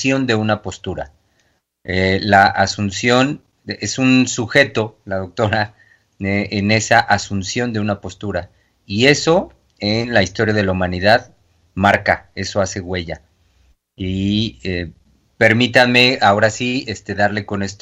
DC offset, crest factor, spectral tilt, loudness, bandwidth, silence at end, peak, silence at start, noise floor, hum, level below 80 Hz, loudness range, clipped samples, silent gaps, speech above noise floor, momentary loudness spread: under 0.1%; 18 dB; -4.5 dB/octave; -16 LUFS; 12.5 kHz; 0.05 s; 0 dBFS; 0 s; -63 dBFS; none; -48 dBFS; 5 LU; under 0.1%; none; 46 dB; 14 LU